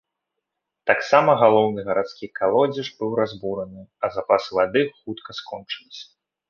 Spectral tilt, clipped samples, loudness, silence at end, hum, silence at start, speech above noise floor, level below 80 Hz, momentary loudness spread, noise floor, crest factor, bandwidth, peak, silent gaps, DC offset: -6 dB/octave; under 0.1%; -21 LUFS; 0.45 s; none; 0.85 s; 60 dB; -62 dBFS; 17 LU; -81 dBFS; 20 dB; 7 kHz; -2 dBFS; none; under 0.1%